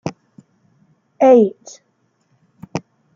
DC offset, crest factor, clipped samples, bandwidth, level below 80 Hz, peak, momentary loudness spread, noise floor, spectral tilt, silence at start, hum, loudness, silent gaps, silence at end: under 0.1%; 18 dB; under 0.1%; 7.4 kHz; -66 dBFS; -2 dBFS; 19 LU; -63 dBFS; -7 dB/octave; 0.05 s; none; -13 LUFS; none; 0.35 s